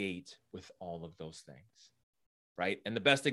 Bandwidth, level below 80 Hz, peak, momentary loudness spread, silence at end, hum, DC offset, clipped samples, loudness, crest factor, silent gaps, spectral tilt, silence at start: 12.5 kHz; -74 dBFS; -12 dBFS; 23 LU; 0 s; none; under 0.1%; under 0.1%; -36 LUFS; 26 dB; 2.03-2.13 s, 2.26-2.55 s; -4 dB/octave; 0 s